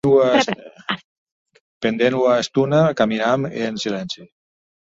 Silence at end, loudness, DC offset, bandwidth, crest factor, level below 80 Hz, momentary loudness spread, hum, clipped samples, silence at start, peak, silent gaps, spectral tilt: 0.6 s; -19 LUFS; under 0.1%; 7.8 kHz; 18 dB; -58 dBFS; 12 LU; none; under 0.1%; 0.05 s; -2 dBFS; 1.04-1.26 s, 1.32-1.45 s, 1.60-1.81 s; -5.5 dB/octave